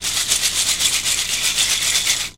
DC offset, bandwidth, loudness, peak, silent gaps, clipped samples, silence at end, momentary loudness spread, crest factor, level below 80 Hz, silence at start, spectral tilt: 0.5%; 17 kHz; -16 LUFS; -2 dBFS; none; under 0.1%; 0.05 s; 2 LU; 18 dB; -46 dBFS; 0 s; 1.5 dB/octave